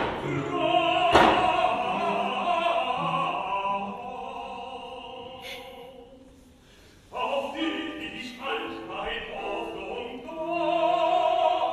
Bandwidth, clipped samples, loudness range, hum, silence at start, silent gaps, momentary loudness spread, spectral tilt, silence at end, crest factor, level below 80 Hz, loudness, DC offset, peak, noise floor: 13 kHz; under 0.1%; 13 LU; none; 0 s; none; 16 LU; -5 dB/octave; 0 s; 22 dB; -54 dBFS; -27 LUFS; under 0.1%; -4 dBFS; -54 dBFS